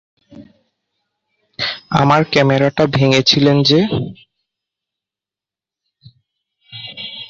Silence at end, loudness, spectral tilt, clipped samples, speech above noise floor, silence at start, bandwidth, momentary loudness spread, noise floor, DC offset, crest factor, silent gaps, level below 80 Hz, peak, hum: 0.05 s; -13 LUFS; -5.5 dB/octave; under 0.1%; 76 dB; 0.35 s; 7.6 kHz; 18 LU; -89 dBFS; under 0.1%; 18 dB; none; -50 dBFS; 0 dBFS; none